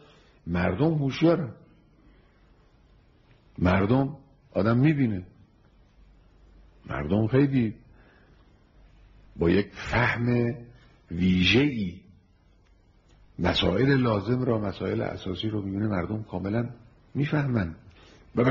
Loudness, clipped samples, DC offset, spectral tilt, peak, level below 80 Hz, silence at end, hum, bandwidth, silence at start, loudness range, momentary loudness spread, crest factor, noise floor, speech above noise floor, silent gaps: -26 LUFS; under 0.1%; under 0.1%; -5.5 dB/octave; -10 dBFS; -48 dBFS; 0 s; none; 7.2 kHz; 0.45 s; 4 LU; 13 LU; 18 dB; -60 dBFS; 35 dB; none